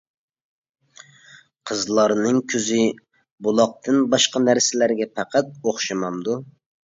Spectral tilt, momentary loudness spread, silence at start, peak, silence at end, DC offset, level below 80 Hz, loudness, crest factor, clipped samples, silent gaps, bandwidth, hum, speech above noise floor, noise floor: -3.5 dB/octave; 10 LU; 1.65 s; -4 dBFS; 0.35 s; under 0.1%; -68 dBFS; -21 LUFS; 18 dB; under 0.1%; 3.31-3.38 s; 7.8 kHz; none; 30 dB; -50 dBFS